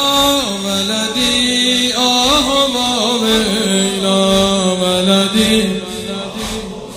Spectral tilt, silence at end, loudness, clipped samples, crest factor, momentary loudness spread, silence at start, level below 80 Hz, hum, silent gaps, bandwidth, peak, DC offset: -3 dB/octave; 0 s; -13 LUFS; under 0.1%; 14 dB; 11 LU; 0 s; -38 dBFS; none; none; 16 kHz; 0 dBFS; under 0.1%